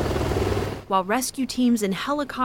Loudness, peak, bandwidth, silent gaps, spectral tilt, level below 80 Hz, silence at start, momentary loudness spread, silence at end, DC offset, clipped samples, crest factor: -24 LUFS; -8 dBFS; 17 kHz; none; -5 dB/octave; -38 dBFS; 0 s; 5 LU; 0 s; under 0.1%; under 0.1%; 16 dB